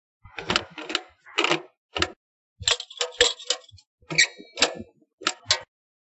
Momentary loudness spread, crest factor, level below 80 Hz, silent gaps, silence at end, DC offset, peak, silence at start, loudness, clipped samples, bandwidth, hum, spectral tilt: 9 LU; 26 dB; -54 dBFS; 1.77-1.89 s, 2.16-2.56 s, 3.87-3.98 s, 5.13-5.18 s; 0.4 s; under 0.1%; -2 dBFS; 0.25 s; -25 LUFS; under 0.1%; 8.8 kHz; none; -1 dB/octave